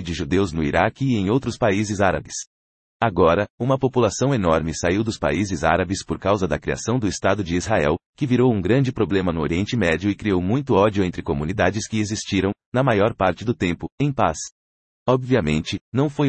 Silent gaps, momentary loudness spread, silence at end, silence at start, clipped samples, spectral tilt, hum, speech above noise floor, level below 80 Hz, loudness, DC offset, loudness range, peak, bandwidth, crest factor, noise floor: 2.47-3.00 s, 3.50-3.58 s, 8.06-8.13 s, 12.66-12.72 s, 13.92-13.98 s, 14.52-15.06 s, 15.81-15.92 s; 6 LU; 0 s; 0 s; under 0.1%; -6 dB/octave; none; over 70 dB; -44 dBFS; -21 LUFS; under 0.1%; 2 LU; -4 dBFS; 8.8 kHz; 18 dB; under -90 dBFS